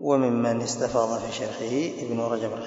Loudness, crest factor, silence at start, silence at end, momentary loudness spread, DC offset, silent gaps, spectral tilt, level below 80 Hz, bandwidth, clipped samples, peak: -26 LUFS; 18 dB; 0 s; 0 s; 7 LU; under 0.1%; none; -5 dB/octave; -60 dBFS; 8 kHz; under 0.1%; -8 dBFS